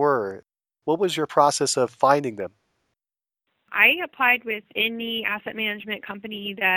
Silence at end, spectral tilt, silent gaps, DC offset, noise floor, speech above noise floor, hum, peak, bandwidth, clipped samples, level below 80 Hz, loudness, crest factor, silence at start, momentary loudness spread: 0 s; -3 dB/octave; none; under 0.1%; under -90 dBFS; over 67 dB; none; -2 dBFS; 19.5 kHz; under 0.1%; -72 dBFS; -22 LUFS; 22 dB; 0 s; 15 LU